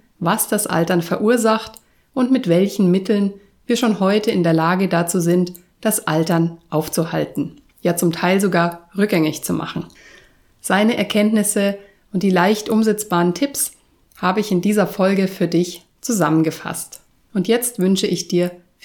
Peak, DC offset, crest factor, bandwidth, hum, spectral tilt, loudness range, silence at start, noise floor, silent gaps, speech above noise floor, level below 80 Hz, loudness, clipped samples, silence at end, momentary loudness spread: -2 dBFS; under 0.1%; 16 dB; 19 kHz; none; -5 dB/octave; 2 LU; 0.2 s; -50 dBFS; none; 32 dB; -58 dBFS; -18 LUFS; under 0.1%; 0.3 s; 9 LU